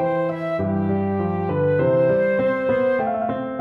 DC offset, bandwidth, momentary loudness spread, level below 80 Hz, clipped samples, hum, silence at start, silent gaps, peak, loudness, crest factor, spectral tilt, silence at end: under 0.1%; 4.5 kHz; 6 LU; -54 dBFS; under 0.1%; none; 0 s; none; -8 dBFS; -21 LUFS; 12 dB; -10 dB/octave; 0 s